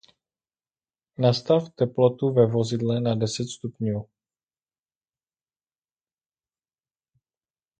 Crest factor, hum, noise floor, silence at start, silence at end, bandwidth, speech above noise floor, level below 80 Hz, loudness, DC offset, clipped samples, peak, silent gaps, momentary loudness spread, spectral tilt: 22 dB; none; under -90 dBFS; 1.2 s; 3.75 s; 9.4 kHz; over 67 dB; -62 dBFS; -24 LUFS; under 0.1%; under 0.1%; -6 dBFS; none; 10 LU; -7 dB/octave